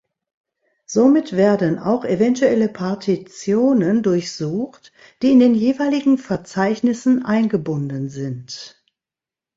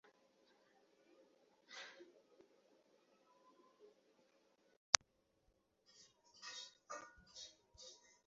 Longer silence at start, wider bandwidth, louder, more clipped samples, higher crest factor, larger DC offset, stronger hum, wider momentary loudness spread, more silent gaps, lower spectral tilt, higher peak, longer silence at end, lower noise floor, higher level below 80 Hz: second, 0.9 s vs 1.7 s; about the same, 7.8 kHz vs 7.6 kHz; first, -18 LUFS vs -41 LUFS; neither; second, 16 dB vs 48 dB; neither; neither; second, 11 LU vs 24 LU; second, none vs 4.77-4.93 s; first, -6.5 dB/octave vs 2.5 dB/octave; about the same, -2 dBFS vs -2 dBFS; first, 0.9 s vs 0.3 s; first, -89 dBFS vs -80 dBFS; first, -60 dBFS vs -84 dBFS